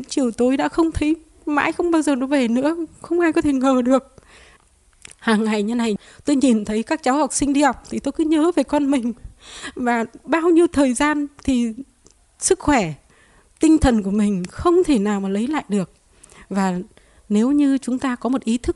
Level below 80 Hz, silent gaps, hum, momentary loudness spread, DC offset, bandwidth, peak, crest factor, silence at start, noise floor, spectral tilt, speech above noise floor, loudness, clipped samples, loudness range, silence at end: -40 dBFS; none; none; 9 LU; under 0.1%; 12 kHz; -4 dBFS; 16 dB; 0 s; -55 dBFS; -5 dB/octave; 36 dB; -19 LUFS; under 0.1%; 2 LU; 0 s